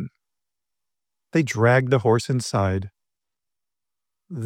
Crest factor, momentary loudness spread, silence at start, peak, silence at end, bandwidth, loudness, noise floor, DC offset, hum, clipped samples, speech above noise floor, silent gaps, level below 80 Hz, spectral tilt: 20 dB; 19 LU; 0 s; -6 dBFS; 0 s; 14 kHz; -21 LUFS; -89 dBFS; under 0.1%; none; under 0.1%; 69 dB; none; -62 dBFS; -6 dB/octave